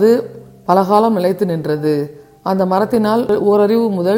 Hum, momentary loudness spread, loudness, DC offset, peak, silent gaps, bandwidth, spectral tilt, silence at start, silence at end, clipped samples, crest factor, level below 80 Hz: none; 10 LU; -15 LUFS; under 0.1%; 0 dBFS; none; 16.5 kHz; -7.5 dB/octave; 0 s; 0 s; under 0.1%; 14 dB; -54 dBFS